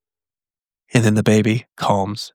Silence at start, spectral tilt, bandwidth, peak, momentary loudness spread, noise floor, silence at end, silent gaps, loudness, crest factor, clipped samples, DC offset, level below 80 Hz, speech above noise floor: 0.95 s; -6 dB/octave; 16 kHz; -2 dBFS; 6 LU; under -90 dBFS; 0.05 s; none; -18 LUFS; 18 dB; under 0.1%; under 0.1%; -58 dBFS; over 73 dB